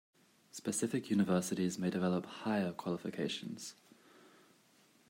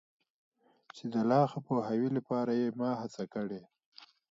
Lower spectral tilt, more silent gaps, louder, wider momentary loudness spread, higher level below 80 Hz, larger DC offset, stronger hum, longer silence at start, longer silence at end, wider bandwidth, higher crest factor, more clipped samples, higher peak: second, -5 dB/octave vs -8 dB/octave; second, none vs 3.86-3.92 s; second, -37 LUFS vs -33 LUFS; about the same, 12 LU vs 11 LU; about the same, -82 dBFS vs -80 dBFS; neither; neither; second, 0.55 s vs 0.95 s; first, 1.35 s vs 0.25 s; first, 16 kHz vs 7.6 kHz; about the same, 18 dB vs 18 dB; neither; second, -20 dBFS vs -16 dBFS